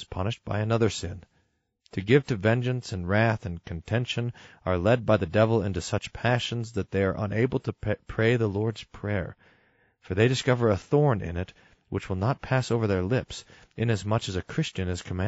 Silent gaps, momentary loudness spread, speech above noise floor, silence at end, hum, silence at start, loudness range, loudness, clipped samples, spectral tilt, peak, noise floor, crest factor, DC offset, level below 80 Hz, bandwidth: none; 12 LU; 45 dB; 0 s; none; 0 s; 2 LU; -27 LUFS; under 0.1%; -5.5 dB/octave; -8 dBFS; -71 dBFS; 20 dB; under 0.1%; -50 dBFS; 8 kHz